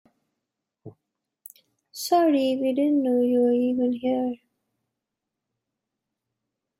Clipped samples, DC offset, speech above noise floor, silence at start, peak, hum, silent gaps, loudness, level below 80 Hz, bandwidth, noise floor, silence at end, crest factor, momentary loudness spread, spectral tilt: under 0.1%; under 0.1%; 63 dB; 0.85 s; -10 dBFS; none; none; -23 LUFS; -74 dBFS; 16 kHz; -85 dBFS; 2.45 s; 16 dB; 11 LU; -5 dB/octave